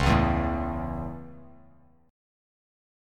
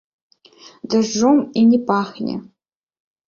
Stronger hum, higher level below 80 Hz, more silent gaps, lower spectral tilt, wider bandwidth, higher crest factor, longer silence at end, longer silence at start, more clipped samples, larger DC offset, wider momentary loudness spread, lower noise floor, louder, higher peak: neither; first, -36 dBFS vs -60 dBFS; neither; first, -7 dB/octave vs -5.5 dB/octave; first, 12 kHz vs 7.4 kHz; about the same, 22 dB vs 18 dB; first, 1 s vs 0.85 s; second, 0 s vs 0.9 s; neither; neither; first, 19 LU vs 13 LU; first, -58 dBFS vs -47 dBFS; second, -28 LUFS vs -17 LUFS; second, -8 dBFS vs -2 dBFS